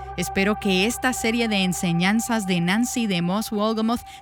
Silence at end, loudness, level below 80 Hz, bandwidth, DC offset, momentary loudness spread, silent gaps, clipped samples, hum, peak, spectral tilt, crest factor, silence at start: 0 s; -22 LUFS; -46 dBFS; 19 kHz; under 0.1%; 3 LU; none; under 0.1%; none; -6 dBFS; -4.5 dB/octave; 16 dB; 0 s